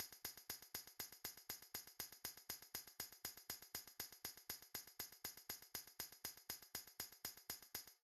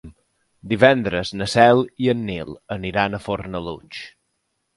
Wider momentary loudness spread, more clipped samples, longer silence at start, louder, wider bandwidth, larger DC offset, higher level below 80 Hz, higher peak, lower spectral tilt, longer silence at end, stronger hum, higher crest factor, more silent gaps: second, 3 LU vs 18 LU; neither; about the same, 0 s vs 0.05 s; second, -52 LUFS vs -20 LUFS; first, 14 kHz vs 11.5 kHz; neither; second, -80 dBFS vs -48 dBFS; second, -32 dBFS vs 0 dBFS; second, -0.5 dB/octave vs -6 dB/octave; second, 0.05 s vs 0.7 s; neither; about the same, 24 dB vs 20 dB; neither